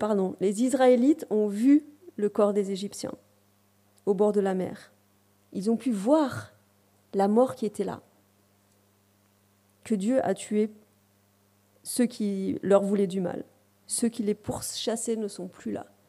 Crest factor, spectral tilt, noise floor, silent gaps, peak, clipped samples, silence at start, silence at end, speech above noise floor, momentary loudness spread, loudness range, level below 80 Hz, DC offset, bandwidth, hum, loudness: 20 dB; -5.5 dB/octave; -65 dBFS; none; -8 dBFS; under 0.1%; 0 s; 0.25 s; 39 dB; 14 LU; 7 LU; -68 dBFS; under 0.1%; 15.5 kHz; none; -27 LUFS